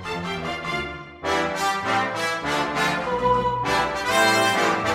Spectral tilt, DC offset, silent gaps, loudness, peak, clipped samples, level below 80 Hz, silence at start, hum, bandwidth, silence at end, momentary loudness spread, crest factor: -3.5 dB/octave; under 0.1%; none; -22 LUFS; -8 dBFS; under 0.1%; -48 dBFS; 0 s; none; 16 kHz; 0 s; 10 LU; 16 dB